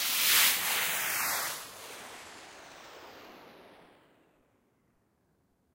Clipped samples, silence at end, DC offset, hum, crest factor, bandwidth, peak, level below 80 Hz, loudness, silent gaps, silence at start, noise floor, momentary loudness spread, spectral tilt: under 0.1%; 2.25 s; under 0.1%; none; 22 dB; 16 kHz; -12 dBFS; -74 dBFS; -26 LUFS; none; 0 s; -72 dBFS; 27 LU; 1.5 dB/octave